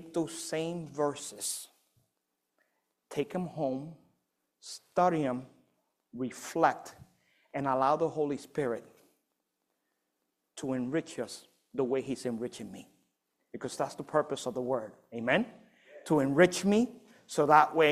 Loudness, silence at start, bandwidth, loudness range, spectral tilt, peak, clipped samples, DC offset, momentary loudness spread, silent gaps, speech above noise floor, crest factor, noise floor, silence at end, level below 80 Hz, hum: -31 LUFS; 0 s; 15.5 kHz; 9 LU; -5 dB/octave; -8 dBFS; under 0.1%; under 0.1%; 20 LU; none; 53 dB; 26 dB; -83 dBFS; 0 s; -72 dBFS; none